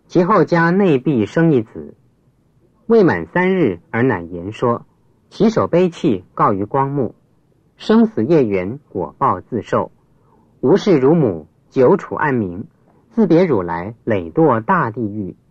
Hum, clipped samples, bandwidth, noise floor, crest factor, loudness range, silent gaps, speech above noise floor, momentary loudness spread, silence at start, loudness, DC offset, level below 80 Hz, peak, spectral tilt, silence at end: none; under 0.1%; 8 kHz; -57 dBFS; 14 dB; 2 LU; none; 41 dB; 12 LU; 0.1 s; -16 LUFS; under 0.1%; -54 dBFS; -2 dBFS; -8.5 dB/octave; 0.15 s